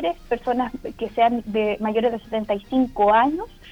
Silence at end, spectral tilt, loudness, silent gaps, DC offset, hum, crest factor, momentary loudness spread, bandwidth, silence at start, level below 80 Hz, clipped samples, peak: 0 s; -7 dB/octave; -22 LUFS; none; under 0.1%; none; 16 dB; 11 LU; 19.5 kHz; 0 s; -46 dBFS; under 0.1%; -6 dBFS